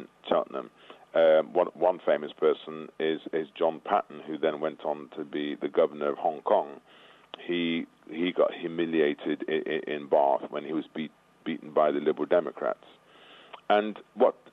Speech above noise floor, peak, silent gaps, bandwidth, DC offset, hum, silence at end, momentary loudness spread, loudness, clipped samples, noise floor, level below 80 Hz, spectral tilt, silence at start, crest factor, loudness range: 26 dB; -10 dBFS; none; 5.4 kHz; under 0.1%; none; 0.2 s; 13 LU; -28 LUFS; under 0.1%; -54 dBFS; -78 dBFS; -7.5 dB/octave; 0 s; 18 dB; 3 LU